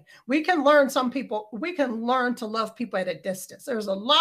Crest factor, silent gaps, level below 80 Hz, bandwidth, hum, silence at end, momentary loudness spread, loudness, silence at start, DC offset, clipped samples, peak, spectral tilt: 20 dB; none; -74 dBFS; 15.5 kHz; none; 0 s; 13 LU; -25 LUFS; 0.3 s; under 0.1%; under 0.1%; -6 dBFS; -3.5 dB/octave